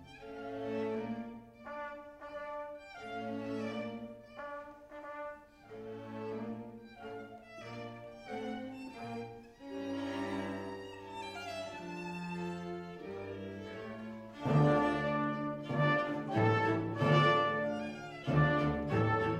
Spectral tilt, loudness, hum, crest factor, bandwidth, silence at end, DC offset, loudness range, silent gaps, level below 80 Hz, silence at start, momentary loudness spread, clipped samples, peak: -7.5 dB/octave; -36 LUFS; none; 20 dB; 10 kHz; 0 s; under 0.1%; 14 LU; none; -62 dBFS; 0 s; 18 LU; under 0.1%; -16 dBFS